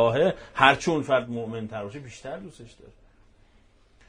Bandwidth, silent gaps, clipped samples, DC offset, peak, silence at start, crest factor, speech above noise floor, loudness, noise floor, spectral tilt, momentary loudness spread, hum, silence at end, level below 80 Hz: 10.5 kHz; none; under 0.1%; under 0.1%; 0 dBFS; 0 s; 26 dB; 33 dB; -24 LUFS; -59 dBFS; -5 dB/octave; 20 LU; none; 1.4 s; -56 dBFS